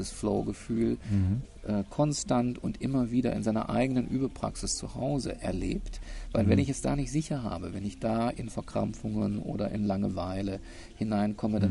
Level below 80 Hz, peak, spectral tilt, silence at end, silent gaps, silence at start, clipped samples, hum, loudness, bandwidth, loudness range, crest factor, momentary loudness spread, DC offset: -44 dBFS; -10 dBFS; -6.5 dB/octave; 0 s; none; 0 s; under 0.1%; none; -31 LUFS; 11.5 kHz; 3 LU; 18 dB; 7 LU; under 0.1%